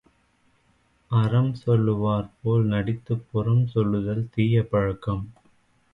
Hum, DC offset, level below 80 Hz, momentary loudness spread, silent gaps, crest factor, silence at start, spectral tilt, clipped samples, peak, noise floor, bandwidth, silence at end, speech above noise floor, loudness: none; under 0.1%; -48 dBFS; 7 LU; none; 16 dB; 1.1 s; -10 dB/octave; under 0.1%; -10 dBFS; -64 dBFS; 5.2 kHz; 0.6 s; 42 dB; -24 LUFS